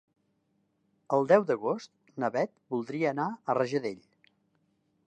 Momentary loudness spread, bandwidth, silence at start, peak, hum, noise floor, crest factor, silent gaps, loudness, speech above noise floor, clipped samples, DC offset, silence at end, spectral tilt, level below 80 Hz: 13 LU; 9.2 kHz; 1.1 s; -8 dBFS; none; -74 dBFS; 24 dB; none; -30 LUFS; 46 dB; under 0.1%; under 0.1%; 1.1 s; -7 dB/octave; -82 dBFS